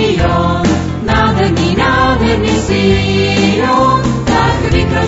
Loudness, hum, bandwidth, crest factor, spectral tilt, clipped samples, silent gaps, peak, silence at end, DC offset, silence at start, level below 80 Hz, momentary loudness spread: -12 LUFS; none; 8 kHz; 10 dB; -6 dB/octave; under 0.1%; none; 0 dBFS; 0 s; under 0.1%; 0 s; -24 dBFS; 3 LU